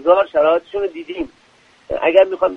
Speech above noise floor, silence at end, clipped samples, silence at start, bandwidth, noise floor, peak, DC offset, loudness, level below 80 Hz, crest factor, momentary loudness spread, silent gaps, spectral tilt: 36 dB; 0 s; under 0.1%; 0 s; 5.4 kHz; -52 dBFS; 0 dBFS; under 0.1%; -17 LUFS; -50 dBFS; 16 dB; 14 LU; none; -6 dB/octave